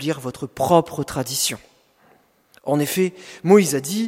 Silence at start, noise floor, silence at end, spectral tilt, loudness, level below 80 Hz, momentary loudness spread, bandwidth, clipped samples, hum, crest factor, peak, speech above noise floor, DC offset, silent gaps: 0 s; -57 dBFS; 0 s; -4.5 dB/octave; -20 LUFS; -56 dBFS; 13 LU; 16.5 kHz; under 0.1%; none; 20 dB; -2 dBFS; 37 dB; under 0.1%; none